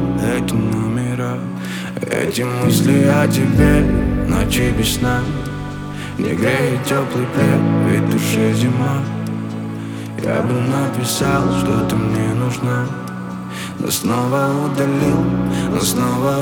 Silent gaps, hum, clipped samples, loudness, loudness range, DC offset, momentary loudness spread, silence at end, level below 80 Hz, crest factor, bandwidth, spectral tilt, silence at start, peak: none; none; under 0.1%; -18 LUFS; 4 LU; under 0.1%; 11 LU; 0 s; -32 dBFS; 16 dB; 19.5 kHz; -6 dB/octave; 0 s; 0 dBFS